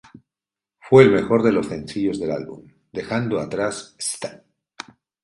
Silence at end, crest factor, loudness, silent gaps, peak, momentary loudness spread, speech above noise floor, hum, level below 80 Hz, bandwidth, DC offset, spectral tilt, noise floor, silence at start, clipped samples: 0.9 s; 22 dB; -20 LUFS; none; 0 dBFS; 24 LU; 70 dB; none; -54 dBFS; 11.5 kHz; under 0.1%; -5.5 dB/octave; -89 dBFS; 0.85 s; under 0.1%